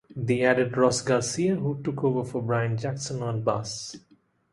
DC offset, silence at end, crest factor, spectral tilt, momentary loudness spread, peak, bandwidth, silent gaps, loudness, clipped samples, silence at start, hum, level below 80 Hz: under 0.1%; 0.55 s; 20 dB; -5.5 dB/octave; 9 LU; -6 dBFS; 11.5 kHz; none; -26 LUFS; under 0.1%; 0.1 s; none; -60 dBFS